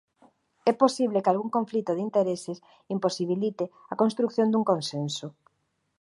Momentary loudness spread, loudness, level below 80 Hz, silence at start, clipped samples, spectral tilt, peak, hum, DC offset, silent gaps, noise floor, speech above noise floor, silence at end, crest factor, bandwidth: 11 LU; -27 LUFS; -78 dBFS; 0.65 s; under 0.1%; -6 dB/octave; -6 dBFS; none; under 0.1%; none; -75 dBFS; 48 dB; 0.7 s; 20 dB; 11.5 kHz